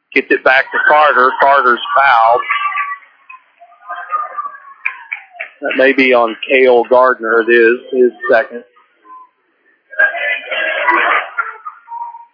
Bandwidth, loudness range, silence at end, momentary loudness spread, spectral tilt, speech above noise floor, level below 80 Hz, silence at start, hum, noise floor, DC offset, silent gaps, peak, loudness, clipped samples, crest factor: 5.4 kHz; 6 LU; 0.15 s; 18 LU; -5 dB/octave; 46 dB; -70 dBFS; 0.1 s; none; -57 dBFS; under 0.1%; none; 0 dBFS; -12 LUFS; under 0.1%; 14 dB